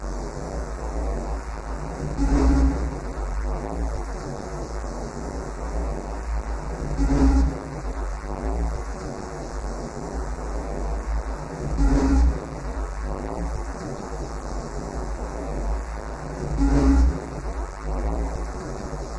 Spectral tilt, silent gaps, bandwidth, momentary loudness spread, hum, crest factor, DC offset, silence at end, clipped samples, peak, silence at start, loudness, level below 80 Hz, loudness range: -7 dB/octave; none; 11 kHz; 12 LU; none; 18 dB; 0.1%; 0 s; under 0.1%; -8 dBFS; 0 s; -28 LUFS; -26 dBFS; 6 LU